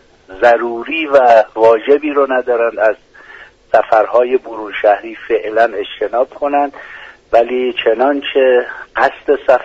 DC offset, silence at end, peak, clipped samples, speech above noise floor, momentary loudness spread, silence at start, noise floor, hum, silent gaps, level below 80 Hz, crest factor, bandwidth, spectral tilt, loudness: under 0.1%; 0 s; 0 dBFS; under 0.1%; 26 dB; 8 LU; 0.3 s; -39 dBFS; none; none; -52 dBFS; 14 dB; 7.8 kHz; -5 dB/octave; -13 LUFS